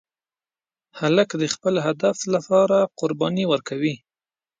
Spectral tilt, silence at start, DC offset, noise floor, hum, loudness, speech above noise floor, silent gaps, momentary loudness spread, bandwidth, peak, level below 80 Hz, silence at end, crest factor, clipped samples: -5 dB/octave; 0.95 s; under 0.1%; under -90 dBFS; none; -21 LUFS; over 69 dB; none; 7 LU; 9.4 kHz; -4 dBFS; -68 dBFS; 0.65 s; 20 dB; under 0.1%